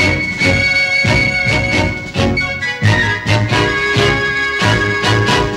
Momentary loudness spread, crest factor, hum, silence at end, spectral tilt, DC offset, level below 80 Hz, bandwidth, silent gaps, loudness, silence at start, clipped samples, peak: 4 LU; 14 dB; none; 0 s; -4.5 dB/octave; under 0.1%; -30 dBFS; 12.5 kHz; none; -13 LUFS; 0 s; under 0.1%; 0 dBFS